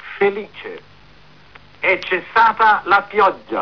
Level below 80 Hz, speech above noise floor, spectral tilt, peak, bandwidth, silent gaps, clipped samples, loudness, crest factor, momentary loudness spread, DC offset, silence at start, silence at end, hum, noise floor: -56 dBFS; 31 dB; -5 dB/octave; -6 dBFS; 5.4 kHz; none; under 0.1%; -16 LUFS; 12 dB; 18 LU; 0.4%; 0 s; 0 s; none; -47 dBFS